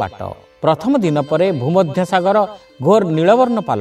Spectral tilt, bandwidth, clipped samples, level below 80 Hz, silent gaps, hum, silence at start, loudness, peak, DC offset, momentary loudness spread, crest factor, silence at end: -7 dB/octave; 13.5 kHz; under 0.1%; -54 dBFS; none; none; 0 s; -15 LUFS; 0 dBFS; under 0.1%; 9 LU; 14 dB; 0 s